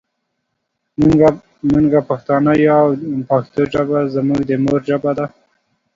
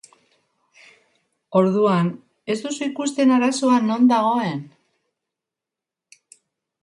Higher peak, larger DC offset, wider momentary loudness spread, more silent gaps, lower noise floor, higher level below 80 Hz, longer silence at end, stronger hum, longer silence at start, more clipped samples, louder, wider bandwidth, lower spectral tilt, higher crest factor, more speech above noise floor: first, 0 dBFS vs -4 dBFS; neither; about the same, 9 LU vs 11 LU; neither; second, -73 dBFS vs -87 dBFS; first, -44 dBFS vs -72 dBFS; second, 0.65 s vs 2.15 s; neither; second, 1 s vs 1.5 s; neither; first, -15 LUFS vs -20 LUFS; second, 7.6 kHz vs 11 kHz; first, -9 dB/octave vs -6 dB/octave; about the same, 16 dB vs 18 dB; second, 58 dB vs 68 dB